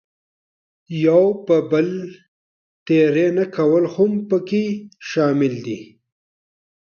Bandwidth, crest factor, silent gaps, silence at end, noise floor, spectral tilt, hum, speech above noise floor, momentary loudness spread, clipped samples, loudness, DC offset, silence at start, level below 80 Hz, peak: 6.8 kHz; 16 dB; 2.28-2.86 s; 1.1 s; under -90 dBFS; -7.5 dB/octave; none; over 72 dB; 14 LU; under 0.1%; -18 LUFS; under 0.1%; 0.9 s; -66 dBFS; -4 dBFS